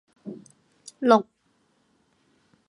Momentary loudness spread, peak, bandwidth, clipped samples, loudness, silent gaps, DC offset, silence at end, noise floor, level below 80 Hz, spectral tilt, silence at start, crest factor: 27 LU; -2 dBFS; 11 kHz; under 0.1%; -22 LUFS; none; under 0.1%; 1.45 s; -68 dBFS; -80 dBFS; -5.5 dB/octave; 0.25 s; 26 dB